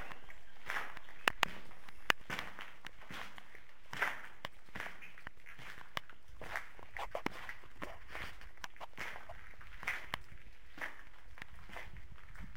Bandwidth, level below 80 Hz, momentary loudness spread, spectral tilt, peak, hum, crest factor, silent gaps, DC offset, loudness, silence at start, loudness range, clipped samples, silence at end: 16.5 kHz; -60 dBFS; 20 LU; -2.5 dB/octave; -12 dBFS; none; 34 dB; none; 0.7%; -43 LUFS; 0 s; 7 LU; under 0.1%; 0 s